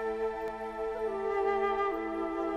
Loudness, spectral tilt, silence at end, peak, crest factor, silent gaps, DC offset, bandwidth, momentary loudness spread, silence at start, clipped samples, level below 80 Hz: -33 LUFS; -6 dB/octave; 0 s; -18 dBFS; 14 dB; none; under 0.1%; 9.8 kHz; 7 LU; 0 s; under 0.1%; -56 dBFS